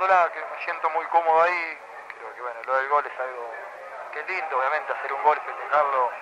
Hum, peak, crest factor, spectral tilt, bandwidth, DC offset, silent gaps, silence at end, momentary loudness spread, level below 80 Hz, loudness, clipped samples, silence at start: 50 Hz at -80 dBFS; -6 dBFS; 18 dB; -3 dB/octave; 11.5 kHz; under 0.1%; none; 0 s; 17 LU; -80 dBFS; -25 LUFS; under 0.1%; 0 s